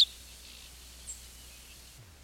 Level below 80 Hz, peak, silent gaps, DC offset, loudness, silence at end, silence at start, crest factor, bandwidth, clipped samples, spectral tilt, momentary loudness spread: -56 dBFS; -12 dBFS; none; under 0.1%; -36 LUFS; 0 s; 0 s; 24 dB; 17 kHz; under 0.1%; 0 dB/octave; 8 LU